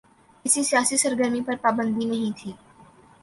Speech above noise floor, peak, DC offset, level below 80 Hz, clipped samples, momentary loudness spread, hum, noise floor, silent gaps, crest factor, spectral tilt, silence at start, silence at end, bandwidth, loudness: 29 dB; -4 dBFS; under 0.1%; -64 dBFS; under 0.1%; 12 LU; none; -52 dBFS; none; 20 dB; -2.5 dB/octave; 0.45 s; 0.65 s; 12 kHz; -23 LUFS